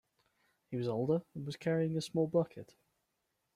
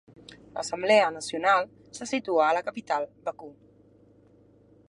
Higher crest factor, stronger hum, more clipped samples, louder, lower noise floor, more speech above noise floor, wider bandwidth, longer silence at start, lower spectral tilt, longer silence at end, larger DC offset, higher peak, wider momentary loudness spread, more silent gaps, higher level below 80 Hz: about the same, 18 dB vs 22 dB; neither; neither; second, -36 LUFS vs -26 LUFS; first, -83 dBFS vs -58 dBFS; first, 48 dB vs 32 dB; first, 13 kHz vs 11.5 kHz; first, 0.7 s vs 0.3 s; first, -7 dB/octave vs -3 dB/octave; second, 0.95 s vs 1.35 s; neither; second, -20 dBFS vs -6 dBFS; second, 11 LU vs 18 LU; neither; about the same, -74 dBFS vs -70 dBFS